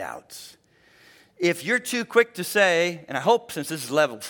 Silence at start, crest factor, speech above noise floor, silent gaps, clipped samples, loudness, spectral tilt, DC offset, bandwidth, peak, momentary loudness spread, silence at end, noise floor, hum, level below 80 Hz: 0 s; 20 dB; 34 dB; none; under 0.1%; -23 LUFS; -3.5 dB/octave; under 0.1%; 18 kHz; -6 dBFS; 15 LU; 0 s; -58 dBFS; none; -74 dBFS